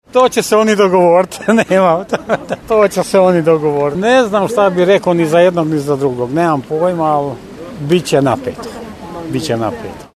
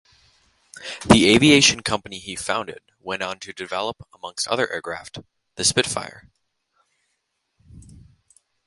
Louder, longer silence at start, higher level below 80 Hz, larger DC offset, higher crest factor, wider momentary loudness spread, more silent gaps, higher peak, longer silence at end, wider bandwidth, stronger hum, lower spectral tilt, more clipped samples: first, -13 LUFS vs -20 LUFS; second, 0.15 s vs 0.75 s; about the same, -46 dBFS vs -48 dBFS; neither; second, 12 dB vs 24 dB; second, 13 LU vs 24 LU; neither; about the same, 0 dBFS vs 0 dBFS; second, 0.1 s vs 0.85 s; first, 13.5 kHz vs 11.5 kHz; neither; first, -5.5 dB/octave vs -3 dB/octave; neither